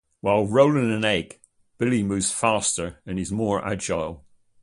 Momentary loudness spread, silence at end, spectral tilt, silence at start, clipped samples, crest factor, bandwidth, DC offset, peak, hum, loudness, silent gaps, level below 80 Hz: 11 LU; 0.45 s; -4.5 dB/octave; 0.25 s; under 0.1%; 18 dB; 11.5 kHz; under 0.1%; -6 dBFS; none; -23 LUFS; none; -50 dBFS